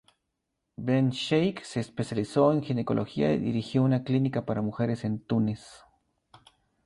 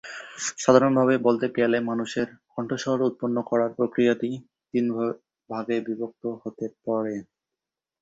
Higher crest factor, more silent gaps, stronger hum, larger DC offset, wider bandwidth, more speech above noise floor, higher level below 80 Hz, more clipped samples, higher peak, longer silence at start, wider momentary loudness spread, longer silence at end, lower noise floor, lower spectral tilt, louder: about the same, 18 dB vs 22 dB; neither; neither; neither; first, 11.5 kHz vs 8 kHz; second, 55 dB vs 64 dB; first, -60 dBFS vs -68 dBFS; neither; second, -10 dBFS vs -4 dBFS; first, 0.8 s vs 0.05 s; second, 8 LU vs 14 LU; first, 1.1 s vs 0.8 s; second, -81 dBFS vs -88 dBFS; first, -7.5 dB/octave vs -5.5 dB/octave; second, -28 LUFS vs -25 LUFS